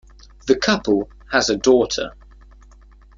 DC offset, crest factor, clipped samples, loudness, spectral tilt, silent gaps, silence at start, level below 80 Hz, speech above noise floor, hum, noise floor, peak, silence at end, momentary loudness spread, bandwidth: under 0.1%; 18 dB; under 0.1%; -19 LUFS; -3.5 dB/octave; none; 0.45 s; -44 dBFS; 29 dB; none; -46 dBFS; -2 dBFS; 1.05 s; 10 LU; 7.6 kHz